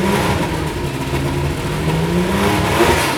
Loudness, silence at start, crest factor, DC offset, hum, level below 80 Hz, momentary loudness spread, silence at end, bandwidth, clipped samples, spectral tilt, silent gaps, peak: -17 LUFS; 0 s; 16 dB; under 0.1%; none; -30 dBFS; 7 LU; 0 s; over 20 kHz; under 0.1%; -5 dB/octave; none; -2 dBFS